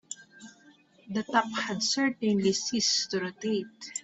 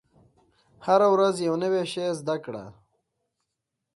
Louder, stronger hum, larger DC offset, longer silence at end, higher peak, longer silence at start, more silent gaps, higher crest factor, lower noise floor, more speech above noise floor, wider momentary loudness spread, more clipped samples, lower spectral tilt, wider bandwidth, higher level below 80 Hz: second, -28 LUFS vs -24 LUFS; neither; neither; second, 0 s vs 1.25 s; second, -12 dBFS vs -8 dBFS; second, 0.1 s vs 0.8 s; neither; about the same, 18 dB vs 20 dB; second, -59 dBFS vs -83 dBFS; second, 30 dB vs 59 dB; second, 10 LU vs 16 LU; neither; second, -3 dB/octave vs -5.5 dB/octave; second, 8.4 kHz vs 11.5 kHz; about the same, -72 dBFS vs -70 dBFS